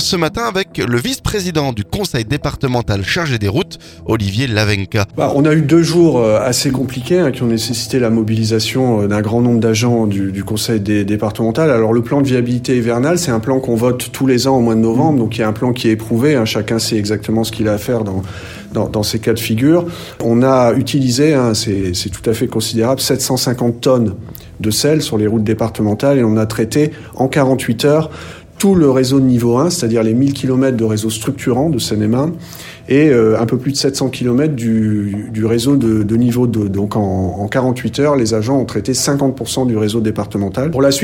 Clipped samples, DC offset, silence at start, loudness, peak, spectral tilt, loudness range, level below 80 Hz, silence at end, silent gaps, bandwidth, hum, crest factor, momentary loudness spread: under 0.1%; under 0.1%; 0 s; -14 LUFS; 0 dBFS; -5.5 dB/octave; 3 LU; -40 dBFS; 0 s; none; 17 kHz; none; 14 dB; 7 LU